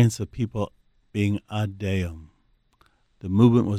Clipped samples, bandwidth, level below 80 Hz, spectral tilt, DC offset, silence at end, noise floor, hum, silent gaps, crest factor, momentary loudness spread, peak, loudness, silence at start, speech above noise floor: under 0.1%; 13.5 kHz; -50 dBFS; -7.5 dB/octave; under 0.1%; 0 s; -64 dBFS; none; none; 20 dB; 15 LU; -6 dBFS; -25 LUFS; 0 s; 42 dB